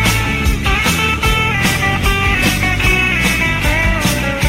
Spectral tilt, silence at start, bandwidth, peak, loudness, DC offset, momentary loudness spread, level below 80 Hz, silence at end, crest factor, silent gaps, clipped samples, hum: -4 dB/octave; 0 s; 16.5 kHz; 0 dBFS; -13 LUFS; under 0.1%; 3 LU; -22 dBFS; 0 s; 14 dB; none; under 0.1%; none